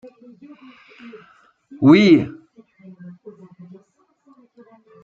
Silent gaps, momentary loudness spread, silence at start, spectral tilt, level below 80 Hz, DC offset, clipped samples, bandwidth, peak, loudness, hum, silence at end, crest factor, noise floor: none; 30 LU; 1.8 s; -7.5 dB/octave; -62 dBFS; under 0.1%; under 0.1%; 7.2 kHz; -2 dBFS; -14 LUFS; none; 2.75 s; 20 dB; -60 dBFS